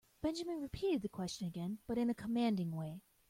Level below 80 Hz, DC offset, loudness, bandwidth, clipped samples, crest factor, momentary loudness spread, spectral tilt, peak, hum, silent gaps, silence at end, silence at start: -64 dBFS; under 0.1%; -39 LUFS; 16.5 kHz; under 0.1%; 16 dB; 7 LU; -6.5 dB/octave; -24 dBFS; none; none; 0.3 s; 0.25 s